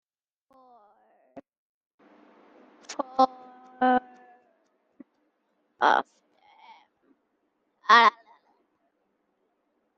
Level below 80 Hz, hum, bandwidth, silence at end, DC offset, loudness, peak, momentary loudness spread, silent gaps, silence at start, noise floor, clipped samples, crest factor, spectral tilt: -76 dBFS; none; 7.8 kHz; 1.9 s; under 0.1%; -23 LUFS; -4 dBFS; 19 LU; 1.58-1.98 s; 1.35 s; -75 dBFS; under 0.1%; 26 dB; -2.5 dB/octave